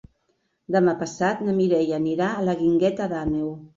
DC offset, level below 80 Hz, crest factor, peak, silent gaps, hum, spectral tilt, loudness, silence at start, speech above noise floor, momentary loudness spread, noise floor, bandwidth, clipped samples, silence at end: under 0.1%; -52 dBFS; 16 dB; -6 dBFS; none; none; -7 dB/octave; -23 LUFS; 0.7 s; 48 dB; 5 LU; -71 dBFS; 7.6 kHz; under 0.1%; 0.1 s